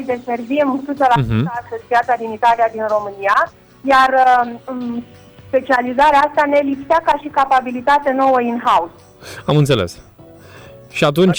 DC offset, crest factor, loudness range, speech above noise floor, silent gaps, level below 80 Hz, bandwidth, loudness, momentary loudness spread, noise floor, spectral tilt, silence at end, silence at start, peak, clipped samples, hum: under 0.1%; 12 dB; 2 LU; 25 dB; none; -46 dBFS; over 20 kHz; -16 LUFS; 12 LU; -40 dBFS; -6 dB/octave; 0 s; 0 s; -4 dBFS; under 0.1%; none